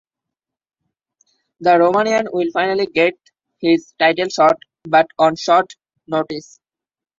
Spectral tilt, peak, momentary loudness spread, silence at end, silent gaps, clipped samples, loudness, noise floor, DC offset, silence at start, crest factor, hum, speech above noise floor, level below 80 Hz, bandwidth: -4.5 dB/octave; -2 dBFS; 9 LU; 0.8 s; none; under 0.1%; -17 LUFS; -89 dBFS; under 0.1%; 1.6 s; 16 dB; none; 73 dB; -64 dBFS; 7.6 kHz